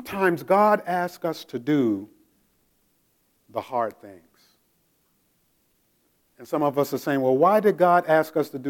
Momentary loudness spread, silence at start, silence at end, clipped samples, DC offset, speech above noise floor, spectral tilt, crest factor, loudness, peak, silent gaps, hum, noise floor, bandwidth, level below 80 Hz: 12 LU; 0 s; 0 s; under 0.1%; under 0.1%; 45 dB; -6.5 dB/octave; 18 dB; -23 LUFS; -6 dBFS; none; none; -68 dBFS; 17.5 kHz; -72 dBFS